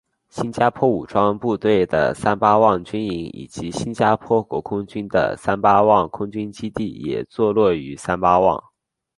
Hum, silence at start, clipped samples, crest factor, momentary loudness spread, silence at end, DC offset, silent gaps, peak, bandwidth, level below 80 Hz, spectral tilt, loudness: none; 0.35 s; under 0.1%; 18 dB; 12 LU; 0.55 s; under 0.1%; none; -2 dBFS; 11.5 kHz; -48 dBFS; -6.5 dB/octave; -19 LUFS